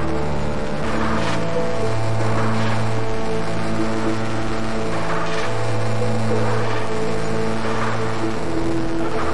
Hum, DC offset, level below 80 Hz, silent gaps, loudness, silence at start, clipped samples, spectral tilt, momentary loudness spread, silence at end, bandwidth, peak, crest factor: none; 10%; -38 dBFS; none; -23 LUFS; 0 s; under 0.1%; -6 dB/octave; 3 LU; 0 s; 11.5 kHz; -8 dBFS; 12 dB